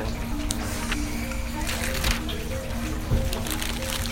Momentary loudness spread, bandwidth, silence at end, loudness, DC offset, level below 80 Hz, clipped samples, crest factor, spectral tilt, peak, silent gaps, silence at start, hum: 5 LU; 16.5 kHz; 0 s; -28 LUFS; under 0.1%; -30 dBFS; under 0.1%; 24 dB; -4 dB/octave; -2 dBFS; none; 0 s; none